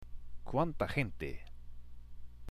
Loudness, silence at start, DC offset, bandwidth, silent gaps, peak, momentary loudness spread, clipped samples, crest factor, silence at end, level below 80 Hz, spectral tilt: -37 LUFS; 0 s; under 0.1%; 13 kHz; none; -20 dBFS; 23 LU; under 0.1%; 18 dB; 0 s; -48 dBFS; -7.5 dB/octave